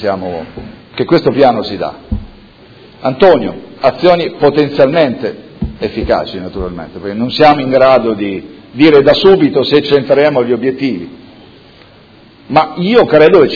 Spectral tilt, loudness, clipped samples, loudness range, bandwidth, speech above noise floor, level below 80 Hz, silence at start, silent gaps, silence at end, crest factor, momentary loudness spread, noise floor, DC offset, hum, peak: -7.5 dB/octave; -11 LUFS; 1%; 5 LU; 5.4 kHz; 30 dB; -36 dBFS; 0 s; none; 0 s; 12 dB; 17 LU; -41 dBFS; under 0.1%; none; 0 dBFS